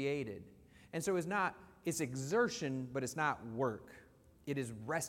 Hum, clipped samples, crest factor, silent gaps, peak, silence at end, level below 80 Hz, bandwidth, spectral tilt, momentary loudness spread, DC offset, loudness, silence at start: none; under 0.1%; 18 dB; none; -20 dBFS; 0 s; -72 dBFS; 16.5 kHz; -5 dB/octave; 12 LU; under 0.1%; -38 LUFS; 0 s